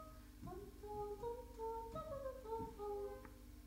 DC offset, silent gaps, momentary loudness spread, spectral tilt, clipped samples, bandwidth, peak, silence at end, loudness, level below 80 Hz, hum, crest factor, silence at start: under 0.1%; none; 9 LU; -6.5 dB/octave; under 0.1%; 16 kHz; -34 dBFS; 0 s; -50 LUFS; -60 dBFS; none; 14 dB; 0 s